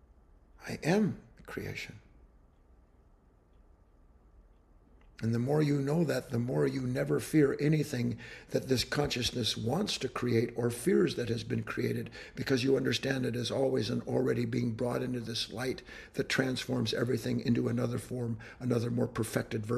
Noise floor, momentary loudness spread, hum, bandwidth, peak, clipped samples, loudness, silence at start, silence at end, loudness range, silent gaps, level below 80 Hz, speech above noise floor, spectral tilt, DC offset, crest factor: -63 dBFS; 10 LU; none; 13 kHz; -12 dBFS; under 0.1%; -32 LUFS; 0.6 s; 0 s; 7 LU; none; -58 dBFS; 31 dB; -5.5 dB/octave; under 0.1%; 20 dB